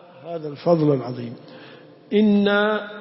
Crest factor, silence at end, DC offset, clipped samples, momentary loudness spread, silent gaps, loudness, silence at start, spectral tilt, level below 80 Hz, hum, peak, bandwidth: 16 dB; 0 s; under 0.1%; under 0.1%; 17 LU; none; -20 LUFS; 0.15 s; -11 dB/octave; -66 dBFS; none; -6 dBFS; 5.8 kHz